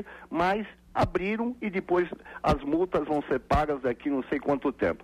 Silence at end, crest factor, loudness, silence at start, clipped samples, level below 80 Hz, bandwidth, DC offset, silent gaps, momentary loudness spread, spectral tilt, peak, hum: 0.1 s; 16 dB; -28 LUFS; 0 s; under 0.1%; -44 dBFS; 13.5 kHz; under 0.1%; none; 5 LU; -7.5 dB/octave; -12 dBFS; none